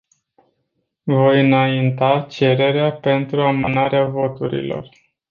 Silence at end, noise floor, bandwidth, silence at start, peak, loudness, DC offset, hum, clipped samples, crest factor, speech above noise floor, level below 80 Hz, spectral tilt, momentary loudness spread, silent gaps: 0.45 s; -72 dBFS; 7 kHz; 1.05 s; -2 dBFS; -17 LUFS; under 0.1%; none; under 0.1%; 16 dB; 55 dB; -54 dBFS; -8.5 dB/octave; 10 LU; none